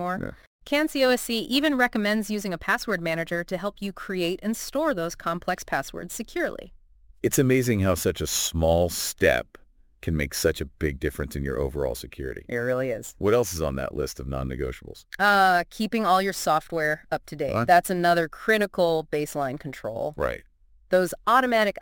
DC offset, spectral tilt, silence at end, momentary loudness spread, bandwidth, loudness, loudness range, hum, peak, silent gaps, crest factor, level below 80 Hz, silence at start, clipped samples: under 0.1%; -4.5 dB/octave; 0.1 s; 11 LU; 17 kHz; -25 LUFS; 5 LU; none; -4 dBFS; 0.47-0.59 s; 20 dB; -44 dBFS; 0 s; under 0.1%